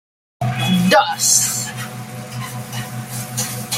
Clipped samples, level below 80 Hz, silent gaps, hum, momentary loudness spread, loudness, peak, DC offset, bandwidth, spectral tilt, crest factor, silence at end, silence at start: under 0.1%; -54 dBFS; none; none; 16 LU; -18 LUFS; 0 dBFS; under 0.1%; 16.5 kHz; -3 dB/octave; 20 dB; 0 s; 0.4 s